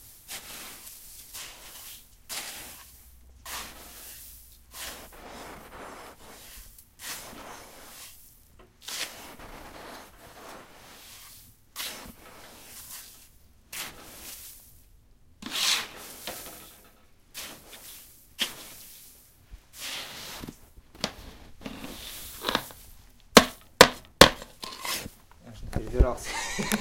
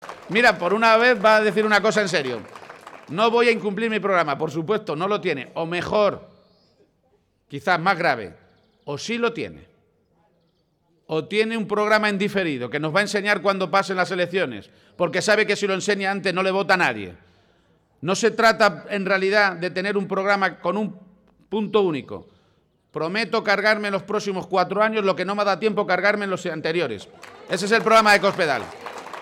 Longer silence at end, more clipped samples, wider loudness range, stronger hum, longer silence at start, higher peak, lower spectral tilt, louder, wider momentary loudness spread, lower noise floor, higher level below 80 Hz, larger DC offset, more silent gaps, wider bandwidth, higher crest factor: about the same, 0 s vs 0 s; neither; first, 20 LU vs 6 LU; neither; about the same, 0 s vs 0 s; first, 0 dBFS vs -6 dBFS; second, -2.5 dB/octave vs -4.5 dB/octave; second, -27 LUFS vs -21 LUFS; first, 23 LU vs 15 LU; second, -57 dBFS vs -66 dBFS; first, -42 dBFS vs -62 dBFS; neither; neither; about the same, 16.5 kHz vs 16 kHz; first, 32 dB vs 16 dB